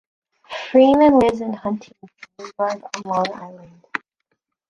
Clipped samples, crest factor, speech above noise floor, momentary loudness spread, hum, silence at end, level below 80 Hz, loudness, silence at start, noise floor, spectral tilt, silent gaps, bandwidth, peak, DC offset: under 0.1%; 18 dB; 55 dB; 23 LU; none; 0.7 s; -54 dBFS; -18 LUFS; 0.5 s; -74 dBFS; -5.5 dB/octave; none; 10.5 kHz; -2 dBFS; under 0.1%